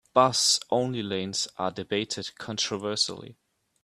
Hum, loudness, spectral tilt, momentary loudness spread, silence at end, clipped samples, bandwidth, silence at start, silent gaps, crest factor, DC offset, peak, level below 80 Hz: none; -26 LUFS; -2.5 dB/octave; 11 LU; 0.5 s; under 0.1%; 14 kHz; 0.15 s; none; 22 dB; under 0.1%; -6 dBFS; -68 dBFS